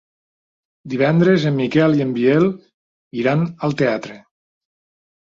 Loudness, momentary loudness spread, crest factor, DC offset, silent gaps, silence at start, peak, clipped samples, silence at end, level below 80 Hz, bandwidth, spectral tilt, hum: -17 LUFS; 13 LU; 16 dB; under 0.1%; 2.74-3.11 s; 0.85 s; -4 dBFS; under 0.1%; 1.15 s; -60 dBFS; 7.4 kHz; -8 dB/octave; none